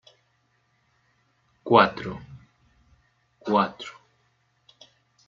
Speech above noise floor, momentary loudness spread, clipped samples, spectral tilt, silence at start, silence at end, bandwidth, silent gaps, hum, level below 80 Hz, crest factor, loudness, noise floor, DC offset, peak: 47 dB; 23 LU; under 0.1%; -6.5 dB/octave; 1.65 s; 1.35 s; 7.6 kHz; none; none; -62 dBFS; 26 dB; -23 LUFS; -69 dBFS; under 0.1%; -2 dBFS